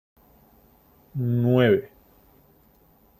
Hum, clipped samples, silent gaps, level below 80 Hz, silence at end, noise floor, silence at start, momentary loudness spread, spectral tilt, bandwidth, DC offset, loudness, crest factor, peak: none; under 0.1%; none; -60 dBFS; 1.35 s; -58 dBFS; 1.15 s; 12 LU; -9 dB/octave; 14.5 kHz; under 0.1%; -22 LUFS; 20 dB; -8 dBFS